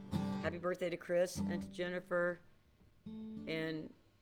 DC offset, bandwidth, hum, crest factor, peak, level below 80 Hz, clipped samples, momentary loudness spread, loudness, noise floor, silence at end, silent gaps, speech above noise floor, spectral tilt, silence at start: under 0.1%; 18.5 kHz; none; 16 dB; -24 dBFS; -66 dBFS; under 0.1%; 14 LU; -39 LUFS; -67 dBFS; 0.3 s; none; 28 dB; -6 dB/octave; 0 s